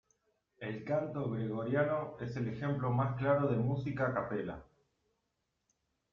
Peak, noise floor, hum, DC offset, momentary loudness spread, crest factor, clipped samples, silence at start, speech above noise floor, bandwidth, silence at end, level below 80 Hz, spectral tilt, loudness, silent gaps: -18 dBFS; -83 dBFS; none; under 0.1%; 11 LU; 18 dB; under 0.1%; 0.6 s; 49 dB; 6.6 kHz; 1.5 s; -66 dBFS; -9.5 dB/octave; -35 LUFS; none